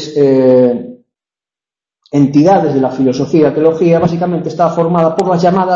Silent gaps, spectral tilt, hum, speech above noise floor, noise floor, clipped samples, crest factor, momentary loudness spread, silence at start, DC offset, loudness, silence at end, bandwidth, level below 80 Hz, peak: none; -8 dB/octave; none; 80 dB; -90 dBFS; under 0.1%; 12 dB; 7 LU; 0 s; under 0.1%; -11 LUFS; 0 s; 8 kHz; -50 dBFS; 0 dBFS